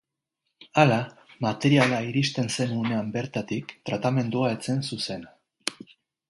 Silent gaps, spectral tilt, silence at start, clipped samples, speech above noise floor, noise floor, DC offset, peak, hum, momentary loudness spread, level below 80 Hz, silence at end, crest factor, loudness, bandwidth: none; -5.5 dB/octave; 0.6 s; under 0.1%; 56 dB; -81 dBFS; under 0.1%; -4 dBFS; none; 13 LU; -64 dBFS; 0.55 s; 24 dB; -26 LUFS; 11.5 kHz